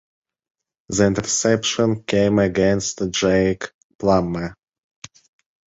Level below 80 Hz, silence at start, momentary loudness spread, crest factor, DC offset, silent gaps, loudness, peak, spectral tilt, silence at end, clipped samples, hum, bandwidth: -44 dBFS; 0.9 s; 9 LU; 18 dB; under 0.1%; 3.74-3.99 s; -19 LUFS; -2 dBFS; -4.5 dB/octave; 1.25 s; under 0.1%; none; 8 kHz